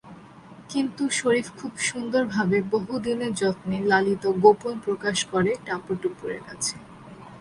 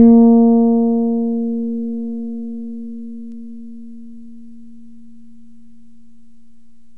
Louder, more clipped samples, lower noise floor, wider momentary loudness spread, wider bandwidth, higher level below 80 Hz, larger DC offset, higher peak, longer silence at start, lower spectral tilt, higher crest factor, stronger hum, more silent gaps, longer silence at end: second, -25 LUFS vs -16 LUFS; neither; second, -46 dBFS vs -53 dBFS; second, 13 LU vs 26 LU; first, 11.5 kHz vs 1.2 kHz; second, -60 dBFS vs -52 dBFS; second, under 0.1% vs 2%; second, -4 dBFS vs 0 dBFS; about the same, 0.05 s vs 0 s; second, -4.5 dB/octave vs -12.5 dB/octave; about the same, 22 dB vs 18 dB; neither; neither; second, 0 s vs 2.6 s